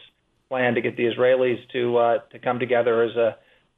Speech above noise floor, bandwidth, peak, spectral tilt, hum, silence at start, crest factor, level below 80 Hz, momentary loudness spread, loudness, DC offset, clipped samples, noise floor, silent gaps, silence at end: 35 dB; 4 kHz; -8 dBFS; -8.5 dB/octave; none; 0.5 s; 14 dB; -68 dBFS; 6 LU; -22 LUFS; under 0.1%; under 0.1%; -56 dBFS; none; 0.45 s